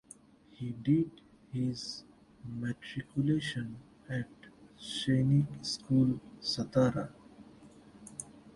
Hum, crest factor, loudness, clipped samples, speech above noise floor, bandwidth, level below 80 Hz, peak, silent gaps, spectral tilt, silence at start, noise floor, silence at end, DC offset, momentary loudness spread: none; 20 dB; -33 LUFS; under 0.1%; 26 dB; 11.5 kHz; -62 dBFS; -16 dBFS; none; -6 dB/octave; 0.6 s; -58 dBFS; 0.05 s; under 0.1%; 17 LU